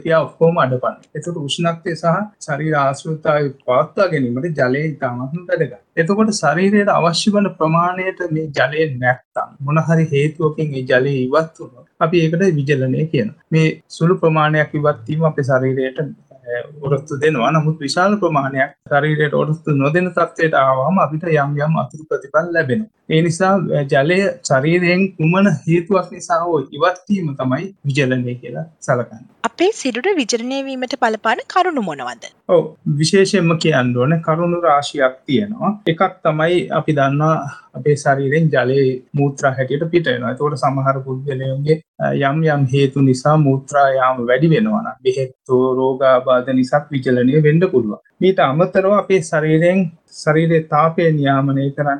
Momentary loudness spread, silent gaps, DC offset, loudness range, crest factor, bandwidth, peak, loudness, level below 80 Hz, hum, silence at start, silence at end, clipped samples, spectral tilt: 8 LU; 9.25-9.32 s, 41.88-41.94 s; under 0.1%; 3 LU; 14 dB; 10.5 kHz; -2 dBFS; -17 LUFS; -60 dBFS; none; 0.05 s; 0 s; under 0.1%; -6.5 dB/octave